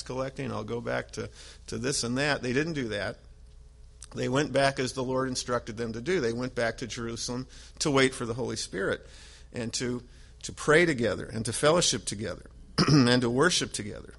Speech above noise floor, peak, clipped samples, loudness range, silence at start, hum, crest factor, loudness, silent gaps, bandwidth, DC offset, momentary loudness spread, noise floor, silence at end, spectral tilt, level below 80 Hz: 22 dB; -8 dBFS; under 0.1%; 6 LU; 0 s; none; 22 dB; -28 LUFS; none; 11.5 kHz; under 0.1%; 15 LU; -50 dBFS; 0.05 s; -4 dB/octave; -50 dBFS